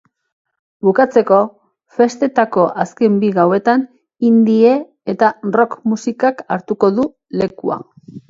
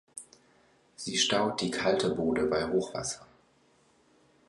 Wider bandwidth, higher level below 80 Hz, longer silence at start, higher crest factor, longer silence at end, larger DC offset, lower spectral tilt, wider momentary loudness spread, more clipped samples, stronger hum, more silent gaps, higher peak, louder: second, 7.6 kHz vs 11.5 kHz; about the same, -60 dBFS vs -60 dBFS; first, 0.85 s vs 0.15 s; second, 14 dB vs 20 dB; second, 0.1 s vs 1.25 s; neither; first, -7 dB/octave vs -3.5 dB/octave; second, 11 LU vs 15 LU; neither; neither; neither; first, 0 dBFS vs -12 dBFS; first, -15 LUFS vs -29 LUFS